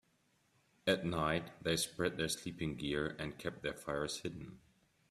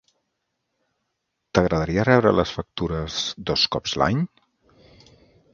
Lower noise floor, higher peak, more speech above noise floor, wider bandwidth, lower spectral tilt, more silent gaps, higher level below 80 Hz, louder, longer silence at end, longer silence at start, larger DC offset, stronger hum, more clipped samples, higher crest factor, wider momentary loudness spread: about the same, -75 dBFS vs -78 dBFS; second, -18 dBFS vs 0 dBFS; second, 37 dB vs 56 dB; first, 15 kHz vs 7.4 kHz; about the same, -4 dB/octave vs -5 dB/octave; neither; second, -62 dBFS vs -44 dBFS; second, -38 LUFS vs -22 LUFS; second, 0.5 s vs 1.3 s; second, 0.85 s vs 1.55 s; neither; neither; neither; about the same, 22 dB vs 24 dB; about the same, 8 LU vs 10 LU